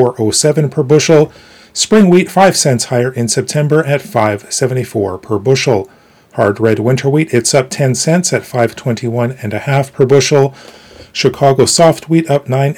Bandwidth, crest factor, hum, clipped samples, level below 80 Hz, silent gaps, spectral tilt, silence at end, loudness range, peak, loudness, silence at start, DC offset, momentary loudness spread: 18 kHz; 12 dB; none; 0.5%; -50 dBFS; none; -5 dB/octave; 0.05 s; 3 LU; 0 dBFS; -12 LUFS; 0 s; under 0.1%; 9 LU